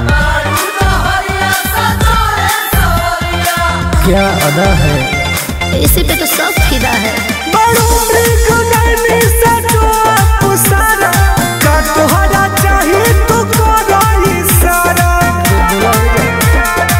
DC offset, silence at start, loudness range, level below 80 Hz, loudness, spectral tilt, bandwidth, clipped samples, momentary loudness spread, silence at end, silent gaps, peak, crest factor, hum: under 0.1%; 0 s; 2 LU; -16 dBFS; -10 LUFS; -4 dB/octave; 16.5 kHz; under 0.1%; 4 LU; 0 s; none; 0 dBFS; 10 dB; none